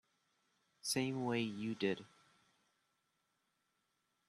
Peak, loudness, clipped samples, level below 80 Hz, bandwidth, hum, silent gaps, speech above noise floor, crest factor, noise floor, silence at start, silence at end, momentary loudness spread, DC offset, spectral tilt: -22 dBFS; -40 LUFS; under 0.1%; -82 dBFS; 12.5 kHz; none; none; 45 dB; 22 dB; -84 dBFS; 0.85 s; 2.2 s; 7 LU; under 0.1%; -4.5 dB/octave